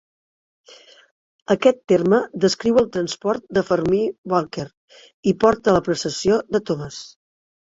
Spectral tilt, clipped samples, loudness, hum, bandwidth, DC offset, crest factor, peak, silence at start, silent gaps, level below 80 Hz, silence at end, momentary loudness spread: -5.5 dB/octave; under 0.1%; -20 LUFS; none; 8 kHz; under 0.1%; 20 dB; -2 dBFS; 1.5 s; 4.18-4.24 s, 4.77-4.88 s, 5.14-5.23 s; -52 dBFS; 0.7 s; 11 LU